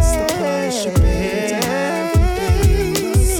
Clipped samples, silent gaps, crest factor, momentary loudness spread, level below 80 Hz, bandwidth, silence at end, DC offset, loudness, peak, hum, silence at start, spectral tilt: under 0.1%; none; 14 dB; 3 LU; -20 dBFS; over 20 kHz; 0 s; under 0.1%; -18 LUFS; -2 dBFS; none; 0 s; -5 dB/octave